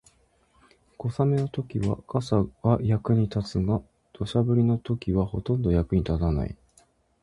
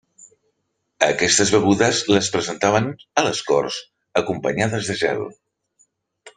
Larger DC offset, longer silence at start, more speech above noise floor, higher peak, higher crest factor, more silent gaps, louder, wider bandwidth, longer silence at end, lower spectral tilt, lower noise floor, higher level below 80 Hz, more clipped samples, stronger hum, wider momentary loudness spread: neither; about the same, 1 s vs 1 s; second, 39 dB vs 54 dB; second, -6 dBFS vs -2 dBFS; about the same, 20 dB vs 20 dB; neither; second, -26 LUFS vs -19 LUFS; about the same, 11 kHz vs 10 kHz; first, 0.7 s vs 0.1 s; first, -9 dB/octave vs -3.5 dB/octave; second, -64 dBFS vs -73 dBFS; first, -40 dBFS vs -56 dBFS; neither; neither; about the same, 7 LU vs 9 LU